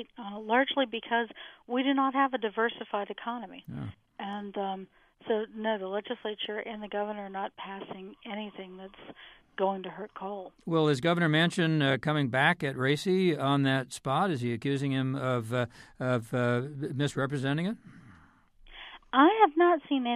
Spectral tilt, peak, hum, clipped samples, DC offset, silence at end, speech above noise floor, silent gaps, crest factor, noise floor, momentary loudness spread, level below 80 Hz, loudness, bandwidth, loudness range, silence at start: -6 dB/octave; -8 dBFS; none; under 0.1%; under 0.1%; 0 s; 29 dB; none; 22 dB; -59 dBFS; 16 LU; -66 dBFS; -29 LUFS; 14 kHz; 10 LU; 0 s